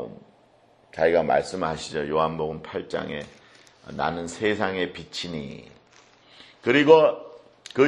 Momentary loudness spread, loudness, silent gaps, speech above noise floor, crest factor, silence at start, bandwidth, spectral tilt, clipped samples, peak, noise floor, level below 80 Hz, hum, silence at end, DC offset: 23 LU; -24 LUFS; none; 35 dB; 22 dB; 0 s; 10.5 kHz; -5 dB/octave; under 0.1%; -2 dBFS; -58 dBFS; -56 dBFS; none; 0 s; under 0.1%